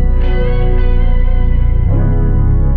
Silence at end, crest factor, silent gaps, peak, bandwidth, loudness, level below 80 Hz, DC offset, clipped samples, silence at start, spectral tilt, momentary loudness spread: 0 s; 8 dB; none; -2 dBFS; 3.5 kHz; -15 LUFS; -10 dBFS; under 0.1%; under 0.1%; 0 s; -11 dB/octave; 2 LU